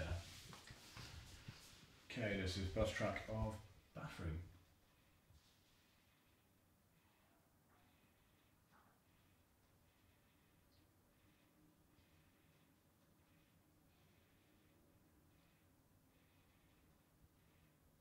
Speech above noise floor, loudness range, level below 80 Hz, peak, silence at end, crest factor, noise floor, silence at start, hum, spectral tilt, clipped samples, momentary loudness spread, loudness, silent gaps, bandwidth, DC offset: 32 dB; 11 LU; -64 dBFS; -26 dBFS; 0.75 s; 26 dB; -76 dBFS; 0 s; none; -5.5 dB/octave; under 0.1%; 17 LU; -47 LUFS; none; 16 kHz; under 0.1%